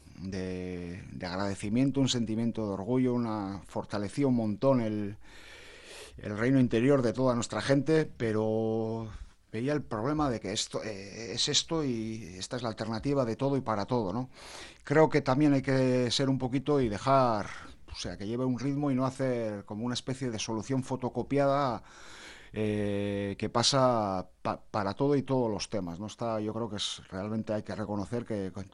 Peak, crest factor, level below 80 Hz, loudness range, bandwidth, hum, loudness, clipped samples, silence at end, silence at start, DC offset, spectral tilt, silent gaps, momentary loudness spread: -10 dBFS; 20 dB; -56 dBFS; 4 LU; 11.5 kHz; none; -30 LUFS; under 0.1%; 0.05 s; 0.1 s; under 0.1%; -5.5 dB/octave; none; 14 LU